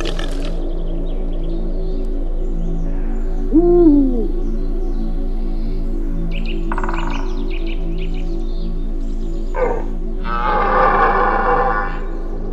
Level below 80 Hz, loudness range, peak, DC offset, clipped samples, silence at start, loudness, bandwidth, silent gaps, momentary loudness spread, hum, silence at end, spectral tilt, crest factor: -18 dBFS; 8 LU; 0 dBFS; under 0.1%; under 0.1%; 0 s; -20 LUFS; 6 kHz; none; 13 LU; none; 0 s; -7.5 dB/octave; 16 dB